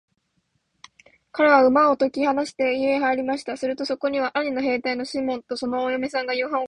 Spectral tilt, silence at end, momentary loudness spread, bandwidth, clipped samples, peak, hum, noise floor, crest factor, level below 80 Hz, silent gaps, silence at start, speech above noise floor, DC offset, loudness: -4 dB/octave; 0 s; 11 LU; 11 kHz; under 0.1%; -4 dBFS; none; -71 dBFS; 20 dB; -64 dBFS; none; 1.35 s; 49 dB; under 0.1%; -22 LUFS